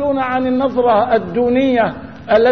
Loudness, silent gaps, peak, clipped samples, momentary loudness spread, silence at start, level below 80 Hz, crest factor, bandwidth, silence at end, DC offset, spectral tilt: -15 LUFS; none; -2 dBFS; under 0.1%; 3 LU; 0 s; -46 dBFS; 14 dB; 6.4 kHz; 0 s; 0.6%; -8 dB/octave